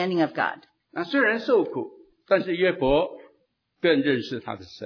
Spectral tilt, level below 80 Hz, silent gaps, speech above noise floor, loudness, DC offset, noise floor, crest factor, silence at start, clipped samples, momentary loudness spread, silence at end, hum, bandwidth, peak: -7 dB/octave; -52 dBFS; none; 46 dB; -24 LUFS; under 0.1%; -69 dBFS; 18 dB; 0 s; under 0.1%; 13 LU; 0 s; none; 5.4 kHz; -8 dBFS